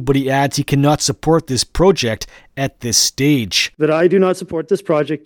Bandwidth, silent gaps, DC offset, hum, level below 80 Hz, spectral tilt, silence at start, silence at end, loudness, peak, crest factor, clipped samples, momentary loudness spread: 19 kHz; none; under 0.1%; none; -38 dBFS; -4 dB/octave; 0 s; 0.1 s; -15 LUFS; 0 dBFS; 16 dB; under 0.1%; 9 LU